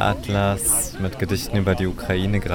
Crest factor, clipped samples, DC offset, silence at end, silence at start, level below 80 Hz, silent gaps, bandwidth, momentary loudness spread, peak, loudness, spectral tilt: 16 dB; under 0.1%; 0.3%; 0 s; 0 s; -36 dBFS; none; 18 kHz; 6 LU; -6 dBFS; -22 LUFS; -4.5 dB/octave